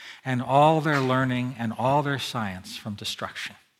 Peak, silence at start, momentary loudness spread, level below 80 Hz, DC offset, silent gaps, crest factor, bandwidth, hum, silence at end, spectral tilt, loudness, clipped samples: -8 dBFS; 0 s; 13 LU; -66 dBFS; under 0.1%; none; 18 dB; 15.5 kHz; none; 0.25 s; -6 dB/octave; -25 LUFS; under 0.1%